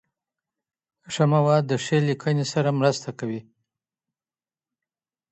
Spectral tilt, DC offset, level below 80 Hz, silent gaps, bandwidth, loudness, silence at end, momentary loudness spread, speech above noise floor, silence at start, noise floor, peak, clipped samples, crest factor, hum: -6 dB/octave; under 0.1%; -68 dBFS; none; 8.4 kHz; -23 LUFS; 1.9 s; 12 LU; over 68 dB; 1.1 s; under -90 dBFS; -6 dBFS; under 0.1%; 20 dB; none